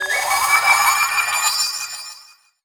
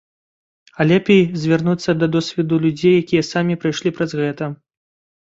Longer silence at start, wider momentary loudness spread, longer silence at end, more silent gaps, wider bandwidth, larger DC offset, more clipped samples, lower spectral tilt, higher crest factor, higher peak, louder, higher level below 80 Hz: second, 0 s vs 0.8 s; first, 15 LU vs 7 LU; second, 0.4 s vs 0.65 s; neither; first, over 20 kHz vs 7.8 kHz; neither; neither; second, 3 dB/octave vs -6.5 dB/octave; about the same, 18 dB vs 16 dB; about the same, -2 dBFS vs -2 dBFS; about the same, -16 LUFS vs -17 LUFS; about the same, -58 dBFS vs -56 dBFS